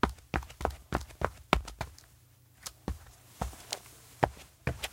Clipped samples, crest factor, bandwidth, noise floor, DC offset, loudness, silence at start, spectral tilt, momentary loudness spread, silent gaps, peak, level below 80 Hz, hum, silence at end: under 0.1%; 34 dB; 17 kHz; -61 dBFS; under 0.1%; -37 LUFS; 0.05 s; -4.5 dB/octave; 14 LU; none; -2 dBFS; -44 dBFS; none; 0 s